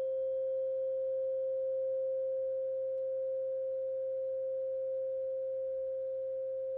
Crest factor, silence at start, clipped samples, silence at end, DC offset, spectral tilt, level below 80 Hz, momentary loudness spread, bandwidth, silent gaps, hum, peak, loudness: 4 dB; 0 s; under 0.1%; 0 s; under 0.1%; -6.5 dB/octave; -78 dBFS; 3 LU; 1.7 kHz; none; none; -30 dBFS; -36 LUFS